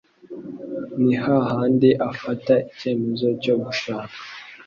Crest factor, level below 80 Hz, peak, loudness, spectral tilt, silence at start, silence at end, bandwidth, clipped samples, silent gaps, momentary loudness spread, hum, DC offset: 18 dB; -60 dBFS; -4 dBFS; -21 LUFS; -7 dB/octave; 0.25 s; 0.05 s; 7 kHz; under 0.1%; none; 18 LU; none; under 0.1%